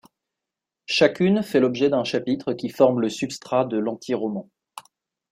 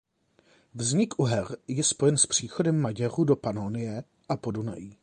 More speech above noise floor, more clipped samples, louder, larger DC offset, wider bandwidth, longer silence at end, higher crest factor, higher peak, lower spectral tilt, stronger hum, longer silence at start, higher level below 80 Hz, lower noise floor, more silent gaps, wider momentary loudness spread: first, 65 dB vs 38 dB; neither; first, -22 LUFS vs -27 LUFS; neither; first, 16 kHz vs 10.5 kHz; first, 0.5 s vs 0.1 s; about the same, 20 dB vs 18 dB; first, -4 dBFS vs -10 dBFS; about the same, -5.5 dB/octave vs -4.5 dB/octave; neither; first, 0.9 s vs 0.75 s; about the same, -64 dBFS vs -60 dBFS; first, -86 dBFS vs -65 dBFS; neither; about the same, 10 LU vs 11 LU